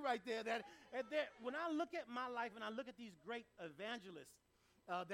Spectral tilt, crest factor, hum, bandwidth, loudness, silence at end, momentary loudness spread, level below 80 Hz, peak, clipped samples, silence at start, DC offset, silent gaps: -4 dB/octave; 20 dB; none; 16 kHz; -47 LUFS; 0 s; 13 LU; -84 dBFS; -28 dBFS; under 0.1%; 0 s; under 0.1%; none